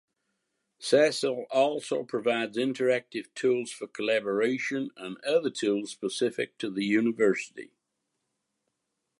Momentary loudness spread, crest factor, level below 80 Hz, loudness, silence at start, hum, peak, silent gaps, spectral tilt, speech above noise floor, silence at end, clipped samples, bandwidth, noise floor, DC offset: 9 LU; 20 dB; -82 dBFS; -28 LUFS; 0.8 s; none; -10 dBFS; none; -4 dB/octave; 54 dB; 1.55 s; under 0.1%; 11.5 kHz; -82 dBFS; under 0.1%